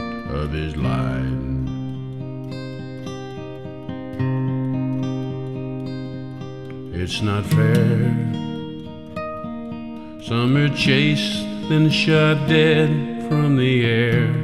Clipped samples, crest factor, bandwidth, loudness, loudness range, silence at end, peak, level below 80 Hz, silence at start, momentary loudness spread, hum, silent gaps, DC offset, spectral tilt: under 0.1%; 20 dB; 13 kHz; -20 LUFS; 9 LU; 0 s; -2 dBFS; -42 dBFS; 0 s; 16 LU; none; none; 0.6%; -6.5 dB/octave